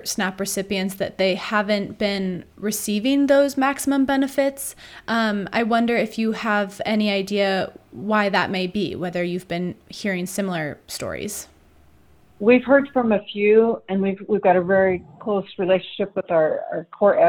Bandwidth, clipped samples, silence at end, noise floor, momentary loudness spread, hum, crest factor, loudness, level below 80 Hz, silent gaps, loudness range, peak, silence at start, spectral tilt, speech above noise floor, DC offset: 19 kHz; under 0.1%; 0 s; -55 dBFS; 11 LU; none; 18 dB; -21 LUFS; -56 dBFS; none; 5 LU; -2 dBFS; 0 s; -4.5 dB/octave; 34 dB; under 0.1%